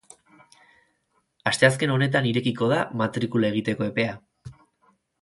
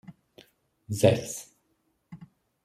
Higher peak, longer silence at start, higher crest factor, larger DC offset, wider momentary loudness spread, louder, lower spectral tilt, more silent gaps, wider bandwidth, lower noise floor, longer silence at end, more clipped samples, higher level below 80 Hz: first, -2 dBFS vs -6 dBFS; first, 1.45 s vs 0.1 s; about the same, 22 dB vs 26 dB; neither; second, 7 LU vs 26 LU; first, -23 LUFS vs -27 LUFS; about the same, -5.5 dB/octave vs -5.5 dB/octave; neither; second, 11.5 kHz vs 16 kHz; about the same, -71 dBFS vs -73 dBFS; first, 0.7 s vs 0.4 s; neither; about the same, -62 dBFS vs -66 dBFS